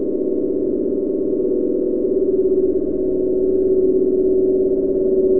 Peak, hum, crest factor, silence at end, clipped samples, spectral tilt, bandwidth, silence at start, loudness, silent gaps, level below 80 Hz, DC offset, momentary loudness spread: -6 dBFS; none; 10 dB; 0 s; under 0.1%; -14.5 dB/octave; 1.4 kHz; 0 s; -18 LUFS; none; -42 dBFS; 2%; 4 LU